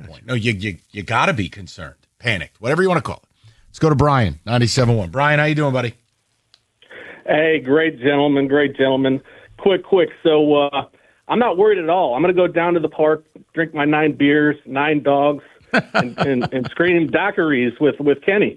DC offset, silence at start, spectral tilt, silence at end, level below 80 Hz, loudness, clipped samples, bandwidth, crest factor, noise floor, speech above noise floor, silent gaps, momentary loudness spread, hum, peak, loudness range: under 0.1%; 0 s; -6.5 dB/octave; 0.05 s; -46 dBFS; -17 LUFS; under 0.1%; 11.5 kHz; 16 dB; -66 dBFS; 49 dB; none; 10 LU; none; -2 dBFS; 3 LU